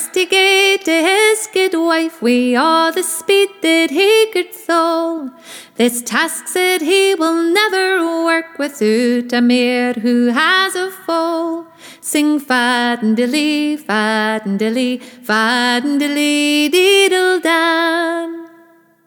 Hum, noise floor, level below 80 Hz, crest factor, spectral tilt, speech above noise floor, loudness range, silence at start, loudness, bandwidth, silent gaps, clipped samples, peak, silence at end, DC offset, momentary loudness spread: none; -48 dBFS; -70 dBFS; 14 dB; -2.5 dB/octave; 34 dB; 3 LU; 0 s; -14 LUFS; 19.5 kHz; none; under 0.1%; -2 dBFS; 0.6 s; under 0.1%; 8 LU